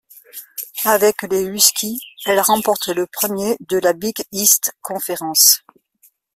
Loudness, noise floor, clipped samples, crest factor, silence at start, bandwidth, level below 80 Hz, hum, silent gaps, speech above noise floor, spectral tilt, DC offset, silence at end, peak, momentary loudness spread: -16 LUFS; -57 dBFS; under 0.1%; 18 dB; 0.15 s; 16.5 kHz; -60 dBFS; none; none; 39 dB; -1.5 dB/octave; under 0.1%; 0.8 s; 0 dBFS; 14 LU